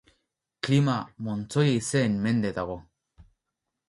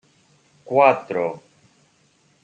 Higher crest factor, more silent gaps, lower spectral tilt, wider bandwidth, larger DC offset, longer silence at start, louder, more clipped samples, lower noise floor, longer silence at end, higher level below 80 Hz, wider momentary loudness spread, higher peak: about the same, 18 dB vs 22 dB; neither; about the same, -6 dB/octave vs -6.5 dB/octave; first, 11.5 kHz vs 8.6 kHz; neither; about the same, 0.65 s vs 0.7 s; second, -26 LUFS vs -19 LUFS; neither; first, -84 dBFS vs -61 dBFS; second, 0.65 s vs 1.05 s; first, -58 dBFS vs -74 dBFS; about the same, 11 LU vs 13 LU; second, -10 dBFS vs -2 dBFS